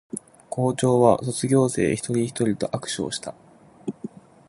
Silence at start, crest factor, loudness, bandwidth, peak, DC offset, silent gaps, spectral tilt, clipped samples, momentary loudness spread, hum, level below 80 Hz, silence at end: 0.15 s; 22 dB; -23 LUFS; 11.5 kHz; -2 dBFS; under 0.1%; none; -5.5 dB/octave; under 0.1%; 18 LU; none; -56 dBFS; 0.4 s